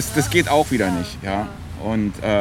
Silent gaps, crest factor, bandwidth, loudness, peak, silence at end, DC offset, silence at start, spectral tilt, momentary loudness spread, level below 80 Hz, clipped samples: none; 18 dB; 17.5 kHz; -21 LUFS; -2 dBFS; 0 s; under 0.1%; 0 s; -5 dB/octave; 9 LU; -38 dBFS; under 0.1%